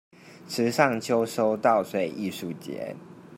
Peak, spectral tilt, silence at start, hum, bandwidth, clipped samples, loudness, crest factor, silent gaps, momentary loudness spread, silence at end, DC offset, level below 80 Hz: -4 dBFS; -5 dB/octave; 0.25 s; none; 16 kHz; under 0.1%; -26 LUFS; 22 dB; none; 13 LU; 0 s; under 0.1%; -72 dBFS